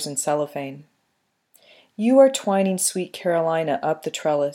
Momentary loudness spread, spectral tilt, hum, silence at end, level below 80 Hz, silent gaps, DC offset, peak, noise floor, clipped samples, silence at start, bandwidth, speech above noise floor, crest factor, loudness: 13 LU; -4.5 dB/octave; none; 0 s; -82 dBFS; none; under 0.1%; -2 dBFS; -72 dBFS; under 0.1%; 0 s; 16.5 kHz; 51 dB; 20 dB; -21 LUFS